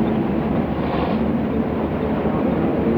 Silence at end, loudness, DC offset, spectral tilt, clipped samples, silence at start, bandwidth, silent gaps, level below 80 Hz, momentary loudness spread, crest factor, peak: 0 s; -21 LUFS; under 0.1%; -10 dB/octave; under 0.1%; 0 s; 5.2 kHz; none; -36 dBFS; 2 LU; 12 dB; -8 dBFS